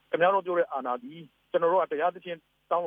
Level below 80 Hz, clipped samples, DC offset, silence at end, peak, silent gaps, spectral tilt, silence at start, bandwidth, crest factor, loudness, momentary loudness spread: -82 dBFS; under 0.1%; under 0.1%; 0 s; -10 dBFS; none; -7.5 dB/octave; 0.1 s; 3.7 kHz; 18 dB; -27 LUFS; 16 LU